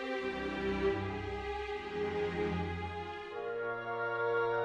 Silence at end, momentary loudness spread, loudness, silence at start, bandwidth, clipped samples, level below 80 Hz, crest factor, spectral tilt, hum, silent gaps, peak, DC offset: 0 s; 7 LU; -37 LUFS; 0 s; 9.2 kHz; under 0.1%; -54 dBFS; 16 dB; -6.5 dB/octave; none; none; -20 dBFS; under 0.1%